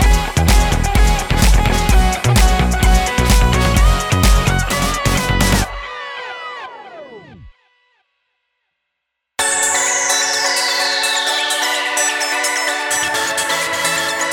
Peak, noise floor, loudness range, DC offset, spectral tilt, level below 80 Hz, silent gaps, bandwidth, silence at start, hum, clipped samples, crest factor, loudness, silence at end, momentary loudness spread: 0 dBFS; -76 dBFS; 10 LU; under 0.1%; -3 dB/octave; -18 dBFS; none; 18 kHz; 0 s; none; under 0.1%; 14 dB; -15 LUFS; 0 s; 13 LU